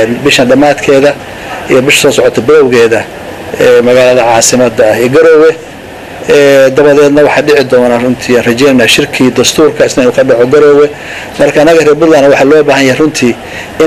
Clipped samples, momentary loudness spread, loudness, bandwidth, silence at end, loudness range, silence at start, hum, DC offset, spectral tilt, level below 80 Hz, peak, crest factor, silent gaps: 4%; 15 LU; -5 LUFS; 16 kHz; 0 s; 1 LU; 0 s; none; under 0.1%; -4 dB/octave; -38 dBFS; 0 dBFS; 6 dB; none